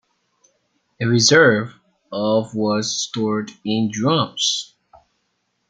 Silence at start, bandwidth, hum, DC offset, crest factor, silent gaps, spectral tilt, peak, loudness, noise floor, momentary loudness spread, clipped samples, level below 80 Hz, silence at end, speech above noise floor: 1 s; 9.6 kHz; none; under 0.1%; 20 dB; none; -3.5 dB/octave; -2 dBFS; -18 LUFS; -71 dBFS; 12 LU; under 0.1%; -62 dBFS; 1.05 s; 52 dB